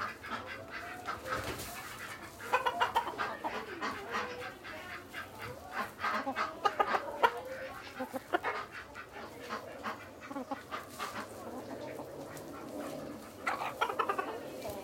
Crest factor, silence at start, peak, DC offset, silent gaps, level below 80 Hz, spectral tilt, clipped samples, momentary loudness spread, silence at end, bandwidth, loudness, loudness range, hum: 26 dB; 0 s; -12 dBFS; under 0.1%; none; -66 dBFS; -3.5 dB/octave; under 0.1%; 12 LU; 0 s; 16.5 kHz; -38 LUFS; 8 LU; none